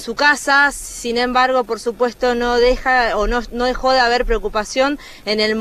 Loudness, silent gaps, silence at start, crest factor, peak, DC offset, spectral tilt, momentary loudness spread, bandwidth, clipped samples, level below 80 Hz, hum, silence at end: -17 LUFS; none; 0 s; 14 dB; -2 dBFS; under 0.1%; -2.5 dB/octave; 7 LU; 14 kHz; under 0.1%; -32 dBFS; none; 0 s